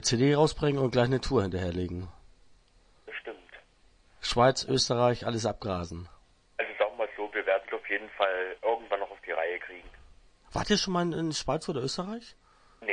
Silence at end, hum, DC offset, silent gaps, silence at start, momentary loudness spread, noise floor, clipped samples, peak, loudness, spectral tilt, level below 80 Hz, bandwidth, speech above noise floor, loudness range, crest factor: 0 s; none; under 0.1%; none; 0 s; 16 LU; -62 dBFS; under 0.1%; -10 dBFS; -29 LUFS; -4.5 dB/octave; -52 dBFS; 10.5 kHz; 34 dB; 3 LU; 20 dB